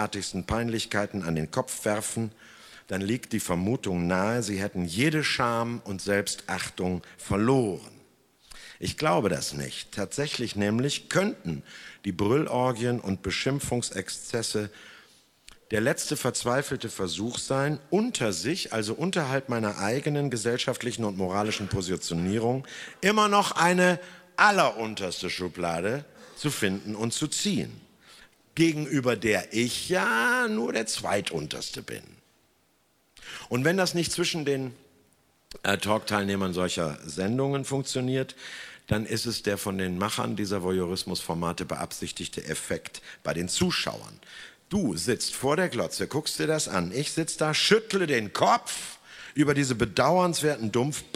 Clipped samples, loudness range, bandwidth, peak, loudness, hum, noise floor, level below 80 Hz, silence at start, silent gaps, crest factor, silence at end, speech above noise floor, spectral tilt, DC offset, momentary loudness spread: under 0.1%; 5 LU; 16 kHz; -4 dBFS; -27 LUFS; none; -67 dBFS; -56 dBFS; 0 s; none; 24 dB; 0.1 s; 40 dB; -4 dB/octave; under 0.1%; 11 LU